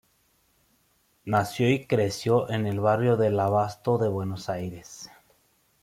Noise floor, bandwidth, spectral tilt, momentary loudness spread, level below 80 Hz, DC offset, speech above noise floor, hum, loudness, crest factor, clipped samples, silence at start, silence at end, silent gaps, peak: -67 dBFS; 15.5 kHz; -6.5 dB/octave; 18 LU; -62 dBFS; under 0.1%; 42 dB; none; -25 LUFS; 18 dB; under 0.1%; 1.25 s; 0.75 s; none; -8 dBFS